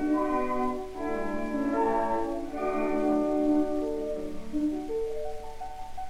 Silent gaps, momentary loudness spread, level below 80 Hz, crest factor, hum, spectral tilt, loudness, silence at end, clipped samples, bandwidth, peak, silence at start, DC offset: none; 11 LU; -46 dBFS; 14 dB; none; -6.5 dB/octave; -30 LUFS; 0 s; under 0.1%; 12.5 kHz; -16 dBFS; 0 s; under 0.1%